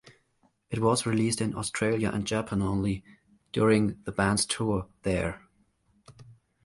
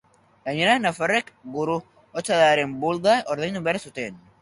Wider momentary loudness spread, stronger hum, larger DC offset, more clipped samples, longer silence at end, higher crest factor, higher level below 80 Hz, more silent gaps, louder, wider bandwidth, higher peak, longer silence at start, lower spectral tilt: second, 8 LU vs 14 LU; neither; neither; neither; about the same, 0.3 s vs 0.25 s; about the same, 18 dB vs 18 dB; first, -50 dBFS vs -64 dBFS; neither; second, -28 LUFS vs -23 LUFS; about the same, 11.5 kHz vs 11.5 kHz; second, -10 dBFS vs -6 dBFS; second, 0.05 s vs 0.45 s; about the same, -5 dB/octave vs -4 dB/octave